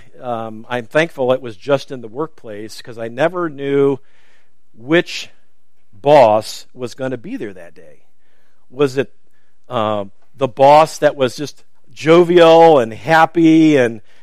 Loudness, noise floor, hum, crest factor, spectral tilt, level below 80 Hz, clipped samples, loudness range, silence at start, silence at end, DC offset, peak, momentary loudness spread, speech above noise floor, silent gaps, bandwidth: -14 LUFS; -67 dBFS; none; 16 dB; -6 dB/octave; -60 dBFS; under 0.1%; 12 LU; 0.2 s; 0.25 s; 2%; 0 dBFS; 19 LU; 52 dB; none; 14.5 kHz